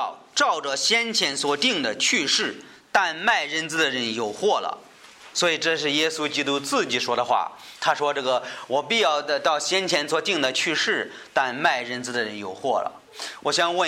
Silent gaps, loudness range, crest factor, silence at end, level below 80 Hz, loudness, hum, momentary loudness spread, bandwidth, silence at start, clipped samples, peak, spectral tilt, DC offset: none; 2 LU; 18 dB; 0 s; -72 dBFS; -23 LUFS; none; 7 LU; 16 kHz; 0 s; under 0.1%; -6 dBFS; -1.5 dB/octave; under 0.1%